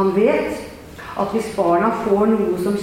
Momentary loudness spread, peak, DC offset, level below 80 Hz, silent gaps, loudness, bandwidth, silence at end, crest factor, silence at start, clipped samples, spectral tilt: 14 LU; -4 dBFS; under 0.1%; -48 dBFS; none; -19 LUFS; 16.5 kHz; 0 s; 14 dB; 0 s; under 0.1%; -6.5 dB/octave